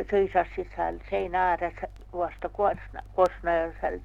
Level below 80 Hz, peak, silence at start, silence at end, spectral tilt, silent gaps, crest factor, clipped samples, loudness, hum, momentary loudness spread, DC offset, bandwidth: -44 dBFS; -10 dBFS; 0 s; 0 s; -7 dB/octave; none; 18 dB; under 0.1%; -28 LUFS; none; 9 LU; under 0.1%; 9.4 kHz